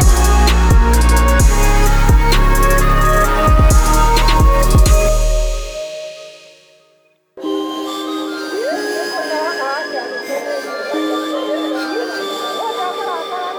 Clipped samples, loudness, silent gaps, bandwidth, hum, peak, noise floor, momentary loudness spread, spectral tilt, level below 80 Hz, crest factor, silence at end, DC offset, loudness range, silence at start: under 0.1%; -15 LUFS; none; over 20 kHz; none; 0 dBFS; -56 dBFS; 10 LU; -4.5 dB/octave; -14 dBFS; 12 dB; 0 s; under 0.1%; 10 LU; 0 s